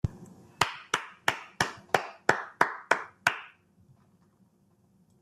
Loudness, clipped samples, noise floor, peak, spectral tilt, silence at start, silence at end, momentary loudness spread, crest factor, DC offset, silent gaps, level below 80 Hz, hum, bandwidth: -30 LUFS; under 0.1%; -66 dBFS; -6 dBFS; -3 dB/octave; 0.05 s; 1.75 s; 9 LU; 28 dB; under 0.1%; none; -56 dBFS; none; 14.5 kHz